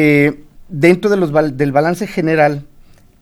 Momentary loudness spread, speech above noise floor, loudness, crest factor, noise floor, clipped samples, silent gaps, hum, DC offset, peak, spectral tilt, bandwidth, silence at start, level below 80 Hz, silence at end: 11 LU; 30 dB; -14 LUFS; 14 dB; -43 dBFS; under 0.1%; none; none; under 0.1%; 0 dBFS; -7 dB/octave; 15 kHz; 0 s; -44 dBFS; 0.6 s